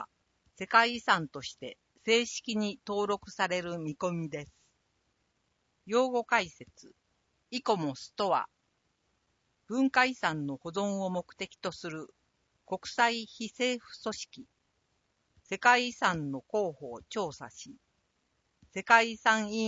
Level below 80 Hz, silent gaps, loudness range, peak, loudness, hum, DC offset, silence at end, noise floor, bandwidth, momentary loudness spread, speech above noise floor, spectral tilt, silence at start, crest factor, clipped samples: -70 dBFS; none; 4 LU; -8 dBFS; -30 LUFS; none; under 0.1%; 0 s; -77 dBFS; 8 kHz; 17 LU; 46 dB; -3.5 dB/octave; 0 s; 26 dB; under 0.1%